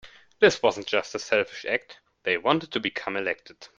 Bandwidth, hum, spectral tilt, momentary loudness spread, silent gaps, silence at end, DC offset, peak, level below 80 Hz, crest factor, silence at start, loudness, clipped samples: 7.8 kHz; none; -3.5 dB/octave; 9 LU; none; 0.15 s; under 0.1%; -4 dBFS; -66 dBFS; 22 dB; 0.05 s; -26 LUFS; under 0.1%